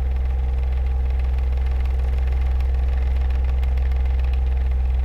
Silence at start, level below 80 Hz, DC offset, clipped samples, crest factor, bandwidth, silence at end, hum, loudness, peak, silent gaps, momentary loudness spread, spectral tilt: 0 s; -20 dBFS; under 0.1%; under 0.1%; 8 dB; 4.2 kHz; 0 s; none; -23 LUFS; -12 dBFS; none; 1 LU; -8 dB/octave